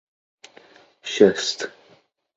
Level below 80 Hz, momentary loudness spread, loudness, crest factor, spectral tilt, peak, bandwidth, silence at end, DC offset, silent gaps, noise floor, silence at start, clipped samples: -64 dBFS; 17 LU; -20 LUFS; 24 dB; -3.5 dB/octave; -2 dBFS; 8 kHz; 0.65 s; under 0.1%; none; -58 dBFS; 1.05 s; under 0.1%